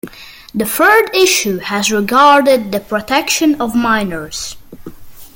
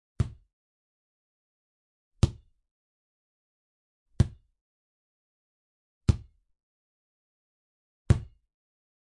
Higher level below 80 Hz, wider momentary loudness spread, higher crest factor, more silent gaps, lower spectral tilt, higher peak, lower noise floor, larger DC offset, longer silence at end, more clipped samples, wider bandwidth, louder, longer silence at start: about the same, -44 dBFS vs -42 dBFS; first, 15 LU vs 6 LU; second, 14 dB vs 26 dB; second, none vs 0.53-2.11 s, 2.71-4.06 s, 4.61-6.01 s, 6.63-8.05 s; second, -3 dB/octave vs -7 dB/octave; first, 0 dBFS vs -8 dBFS; second, -35 dBFS vs under -90 dBFS; neither; second, 0.1 s vs 0.85 s; neither; first, 17 kHz vs 11 kHz; first, -12 LUFS vs -30 LUFS; second, 0.05 s vs 0.2 s